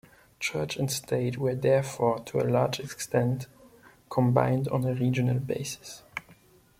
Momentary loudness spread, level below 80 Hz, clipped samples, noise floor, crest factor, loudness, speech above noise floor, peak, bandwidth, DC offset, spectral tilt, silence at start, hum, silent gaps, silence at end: 12 LU; -60 dBFS; under 0.1%; -58 dBFS; 22 dB; -28 LUFS; 31 dB; -8 dBFS; 16 kHz; under 0.1%; -6 dB/octave; 0.4 s; none; none; 0.45 s